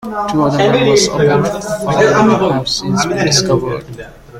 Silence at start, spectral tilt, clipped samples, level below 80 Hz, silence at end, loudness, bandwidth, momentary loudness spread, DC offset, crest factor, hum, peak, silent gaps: 0 s; -4.5 dB/octave; under 0.1%; -40 dBFS; 0 s; -13 LUFS; 16 kHz; 9 LU; under 0.1%; 14 dB; none; 0 dBFS; none